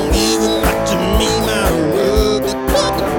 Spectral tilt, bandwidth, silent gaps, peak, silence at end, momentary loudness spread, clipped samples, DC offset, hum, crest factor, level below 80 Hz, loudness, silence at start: -4.5 dB/octave; 19 kHz; none; -2 dBFS; 0 s; 2 LU; under 0.1%; under 0.1%; none; 14 dB; -24 dBFS; -15 LUFS; 0 s